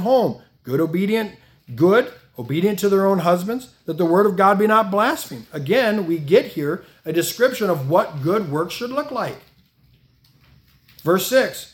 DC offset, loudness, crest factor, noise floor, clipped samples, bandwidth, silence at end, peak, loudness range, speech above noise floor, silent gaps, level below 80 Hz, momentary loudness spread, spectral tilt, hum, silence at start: under 0.1%; -19 LUFS; 18 dB; -56 dBFS; under 0.1%; 18 kHz; 0.1 s; -2 dBFS; 6 LU; 38 dB; none; -62 dBFS; 13 LU; -5.5 dB/octave; none; 0 s